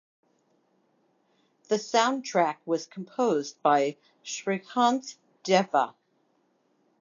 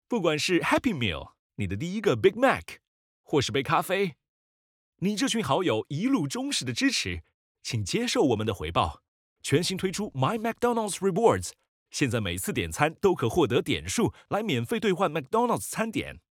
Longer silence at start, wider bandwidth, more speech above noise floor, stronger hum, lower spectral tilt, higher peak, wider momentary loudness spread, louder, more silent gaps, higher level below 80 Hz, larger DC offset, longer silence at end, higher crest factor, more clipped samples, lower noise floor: first, 1.7 s vs 0.1 s; second, 7.6 kHz vs 18 kHz; second, 44 dB vs over 64 dB; neither; about the same, -4 dB/octave vs -4.5 dB/octave; second, -8 dBFS vs -4 dBFS; first, 12 LU vs 8 LU; about the same, -27 LUFS vs -27 LUFS; second, none vs 1.39-1.50 s, 2.88-3.24 s, 4.29-4.93 s, 7.34-7.55 s, 9.08-9.36 s, 11.68-11.86 s; second, -86 dBFS vs -56 dBFS; neither; first, 1.1 s vs 0.15 s; about the same, 20 dB vs 22 dB; neither; second, -70 dBFS vs under -90 dBFS